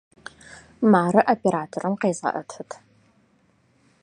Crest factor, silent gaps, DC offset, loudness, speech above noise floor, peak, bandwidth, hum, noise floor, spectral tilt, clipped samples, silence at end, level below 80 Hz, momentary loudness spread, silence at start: 22 dB; none; under 0.1%; -22 LUFS; 41 dB; -2 dBFS; 10 kHz; none; -62 dBFS; -6.5 dB/octave; under 0.1%; 1.3 s; -66 dBFS; 24 LU; 0.5 s